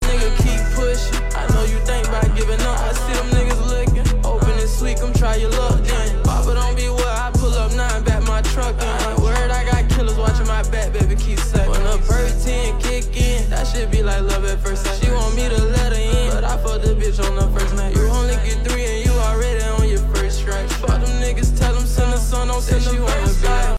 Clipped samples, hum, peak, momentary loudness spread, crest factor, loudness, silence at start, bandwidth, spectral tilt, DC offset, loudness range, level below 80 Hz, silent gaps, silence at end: under 0.1%; none; -6 dBFS; 3 LU; 10 dB; -19 LUFS; 0 s; 14.5 kHz; -5 dB/octave; 0.1%; 1 LU; -16 dBFS; none; 0 s